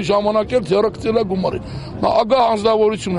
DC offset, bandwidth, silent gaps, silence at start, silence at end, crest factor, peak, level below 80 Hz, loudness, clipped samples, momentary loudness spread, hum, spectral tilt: under 0.1%; 11 kHz; none; 0 s; 0 s; 14 dB; -2 dBFS; -42 dBFS; -17 LUFS; under 0.1%; 7 LU; none; -6 dB/octave